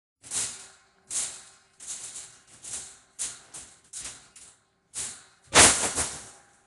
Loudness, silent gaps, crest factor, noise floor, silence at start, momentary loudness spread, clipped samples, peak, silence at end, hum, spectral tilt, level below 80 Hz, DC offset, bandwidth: -24 LUFS; none; 28 dB; -58 dBFS; 0.25 s; 27 LU; under 0.1%; -2 dBFS; 0.35 s; none; -0.5 dB/octave; -52 dBFS; under 0.1%; 12.5 kHz